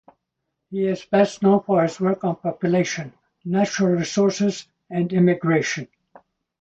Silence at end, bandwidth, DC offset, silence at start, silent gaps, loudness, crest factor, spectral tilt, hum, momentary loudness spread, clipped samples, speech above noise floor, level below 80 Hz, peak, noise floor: 0.75 s; 8.2 kHz; under 0.1%; 0.7 s; none; -21 LUFS; 18 dB; -6 dB/octave; none; 13 LU; under 0.1%; 59 dB; -62 dBFS; -4 dBFS; -79 dBFS